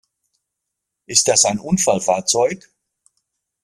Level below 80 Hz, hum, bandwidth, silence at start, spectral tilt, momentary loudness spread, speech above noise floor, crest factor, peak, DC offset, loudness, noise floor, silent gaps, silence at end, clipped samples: -58 dBFS; none; 15 kHz; 1.1 s; -2.5 dB/octave; 5 LU; 63 dB; 20 dB; 0 dBFS; under 0.1%; -16 LUFS; -80 dBFS; none; 1.05 s; under 0.1%